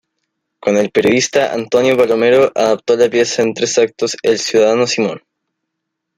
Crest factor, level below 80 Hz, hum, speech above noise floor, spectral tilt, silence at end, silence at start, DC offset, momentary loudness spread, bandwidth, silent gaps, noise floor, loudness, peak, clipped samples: 14 dB; -58 dBFS; none; 63 dB; -3.5 dB/octave; 1 s; 0.65 s; under 0.1%; 5 LU; 14.5 kHz; none; -76 dBFS; -14 LUFS; 0 dBFS; under 0.1%